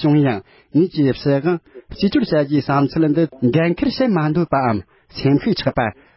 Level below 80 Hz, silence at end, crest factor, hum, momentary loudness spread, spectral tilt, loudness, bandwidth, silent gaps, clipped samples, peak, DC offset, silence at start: -46 dBFS; 0.25 s; 14 dB; none; 5 LU; -11.5 dB/octave; -18 LUFS; 5.8 kHz; none; under 0.1%; -4 dBFS; under 0.1%; 0 s